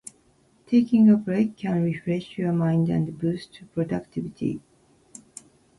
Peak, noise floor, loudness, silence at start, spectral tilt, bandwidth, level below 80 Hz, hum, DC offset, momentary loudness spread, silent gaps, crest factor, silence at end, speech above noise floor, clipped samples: -8 dBFS; -61 dBFS; -24 LUFS; 0.7 s; -8 dB/octave; 11.5 kHz; -60 dBFS; none; under 0.1%; 16 LU; none; 16 dB; 1.2 s; 38 dB; under 0.1%